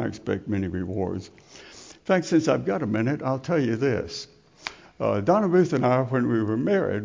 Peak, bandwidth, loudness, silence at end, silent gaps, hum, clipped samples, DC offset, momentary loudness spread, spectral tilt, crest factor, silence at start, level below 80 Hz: -8 dBFS; 7.6 kHz; -24 LUFS; 0 s; none; none; under 0.1%; under 0.1%; 16 LU; -7 dB/octave; 16 dB; 0 s; -52 dBFS